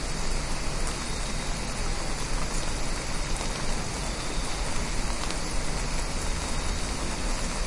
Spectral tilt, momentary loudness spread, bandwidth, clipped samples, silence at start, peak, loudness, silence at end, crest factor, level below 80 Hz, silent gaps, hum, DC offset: -3 dB/octave; 1 LU; 11.5 kHz; under 0.1%; 0 s; -8 dBFS; -31 LUFS; 0 s; 20 dB; -30 dBFS; none; none; under 0.1%